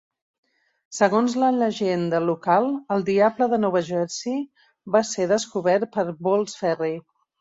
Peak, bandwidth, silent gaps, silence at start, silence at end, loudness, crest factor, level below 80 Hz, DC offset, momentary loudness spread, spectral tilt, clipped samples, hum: -4 dBFS; 8 kHz; none; 0.9 s; 0.4 s; -22 LUFS; 18 dB; -68 dBFS; under 0.1%; 8 LU; -5 dB/octave; under 0.1%; none